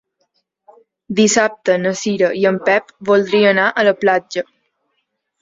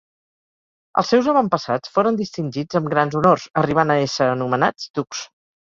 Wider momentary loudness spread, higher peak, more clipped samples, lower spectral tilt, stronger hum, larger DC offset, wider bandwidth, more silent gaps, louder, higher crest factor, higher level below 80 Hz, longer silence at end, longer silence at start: about the same, 8 LU vs 10 LU; about the same, -2 dBFS vs -2 dBFS; neither; second, -4 dB/octave vs -5.5 dB/octave; neither; neither; about the same, 7.8 kHz vs 7.6 kHz; second, none vs 3.50-3.54 s, 4.90-4.94 s; first, -15 LUFS vs -19 LUFS; about the same, 16 dB vs 18 dB; about the same, -62 dBFS vs -58 dBFS; first, 1 s vs 0.5 s; first, 1.1 s vs 0.95 s